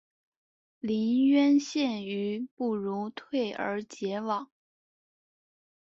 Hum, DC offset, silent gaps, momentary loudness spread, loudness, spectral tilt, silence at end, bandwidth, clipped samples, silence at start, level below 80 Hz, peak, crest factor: none; under 0.1%; 2.51-2.57 s; 11 LU; -29 LUFS; -5.5 dB/octave; 1.5 s; 7.8 kHz; under 0.1%; 0.85 s; -76 dBFS; -14 dBFS; 16 dB